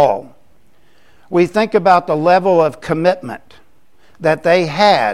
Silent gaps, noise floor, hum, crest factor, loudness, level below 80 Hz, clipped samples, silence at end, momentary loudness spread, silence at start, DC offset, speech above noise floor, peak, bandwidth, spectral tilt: none; -55 dBFS; none; 14 dB; -14 LUFS; -54 dBFS; under 0.1%; 0 s; 11 LU; 0 s; 0.7%; 42 dB; 0 dBFS; 12.5 kHz; -6 dB/octave